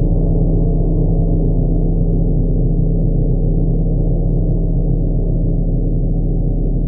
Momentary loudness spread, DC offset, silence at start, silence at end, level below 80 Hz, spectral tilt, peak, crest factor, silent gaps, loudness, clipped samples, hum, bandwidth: 2 LU; under 0.1%; 0 s; 0 s; -16 dBFS; -17 dB/octave; -4 dBFS; 10 dB; none; -17 LUFS; under 0.1%; none; 1 kHz